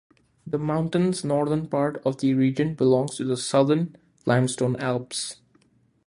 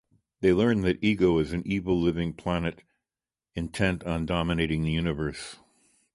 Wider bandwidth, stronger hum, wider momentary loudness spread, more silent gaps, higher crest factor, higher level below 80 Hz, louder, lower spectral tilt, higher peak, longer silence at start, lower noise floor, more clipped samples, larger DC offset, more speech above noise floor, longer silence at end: about the same, 11.5 kHz vs 11.5 kHz; neither; about the same, 9 LU vs 11 LU; neither; about the same, 18 dB vs 18 dB; second, -62 dBFS vs -44 dBFS; first, -24 LUFS vs -27 LUFS; about the same, -6 dB/octave vs -7 dB/octave; first, -6 dBFS vs -10 dBFS; about the same, 0.45 s vs 0.4 s; second, -62 dBFS vs under -90 dBFS; neither; neither; second, 39 dB vs over 64 dB; first, 0.75 s vs 0.6 s